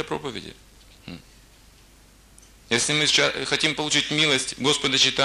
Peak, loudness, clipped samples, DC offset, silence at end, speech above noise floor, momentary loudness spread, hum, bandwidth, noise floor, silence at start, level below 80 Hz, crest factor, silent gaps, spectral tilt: -6 dBFS; -21 LUFS; under 0.1%; under 0.1%; 0 s; 30 dB; 23 LU; none; 15 kHz; -52 dBFS; 0 s; -54 dBFS; 18 dB; none; -2 dB/octave